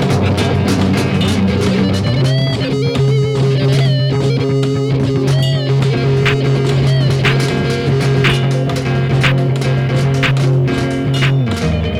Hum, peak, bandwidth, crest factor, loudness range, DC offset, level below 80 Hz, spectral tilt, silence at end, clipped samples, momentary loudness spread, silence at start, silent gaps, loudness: none; 0 dBFS; 12 kHz; 12 dB; 1 LU; under 0.1%; -34 dBFS; -6.5 dB/octave; 0 s; under 0.1%; 3 LU; 0 s; none; -14 LUFS